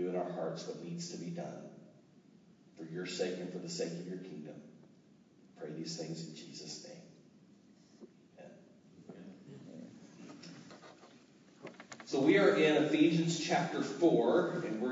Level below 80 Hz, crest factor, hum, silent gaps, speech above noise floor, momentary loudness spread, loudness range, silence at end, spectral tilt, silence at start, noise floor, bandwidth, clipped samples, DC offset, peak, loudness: -88 dBFS; 22 dB; none; none; 30 dB; 25 LU; 23 LU; 0 s; -5.5 dB/octave; 0 s; -63 dBFS; 8 kHz; under 0.1%; under 0.1%; -16 dBFS; -34 LUFS